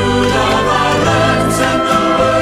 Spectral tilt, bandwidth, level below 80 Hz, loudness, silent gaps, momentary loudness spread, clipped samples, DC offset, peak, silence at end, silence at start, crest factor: -4.5 dB/octave; 16 kHz; -32 dBFS; -12 LUFS; none; 1 LU; under 0.1%; under 0.1%; 0 dBFS; 0 s; 0 s; 12 dB